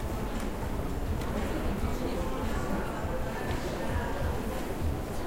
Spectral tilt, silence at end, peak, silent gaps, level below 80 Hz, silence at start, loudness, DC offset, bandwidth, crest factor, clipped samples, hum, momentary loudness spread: -6 dB/octave; 0 s; -18 dBFS; none; -36 dBFS; 0 s; -34 LUFS; under 0.1%; 16 kHz; 12 dB; under 0.1%; none; 2 LU